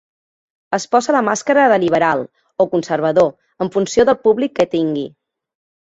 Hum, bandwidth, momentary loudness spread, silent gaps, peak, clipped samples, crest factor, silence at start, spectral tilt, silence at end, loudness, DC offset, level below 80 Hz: none; 8.2 kHz; 10 LU; none; -2 dBFS; under 0.1%; 16 dB; 0.7 s; -5 dB/octave; 0.75 s; -16 LUFS; under 0.1%; -54 dBFS